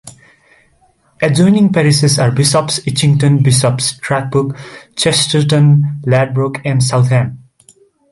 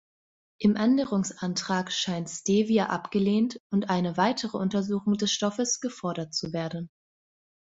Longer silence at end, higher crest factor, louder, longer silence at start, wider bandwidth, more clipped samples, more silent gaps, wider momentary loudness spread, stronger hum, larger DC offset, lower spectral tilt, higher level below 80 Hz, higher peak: about the same, 0.75 s vs 0.85 s; second, 12 dB vs 18 dB; first, -12 LUFS vs -27 LUFS; second, 0.05 s vs 0.6 s; first, 12 kHz vs 8 kHz; neither; second, none vs 3.60-3.70 s; about the same, 7 LU vs 8 LU; neither; neither; about the same, -5 dB/octave vs -4.5 dB/octave; first, -46 dBFS vs -66 dBFS; first, 0 dBFS vs -10 dBFS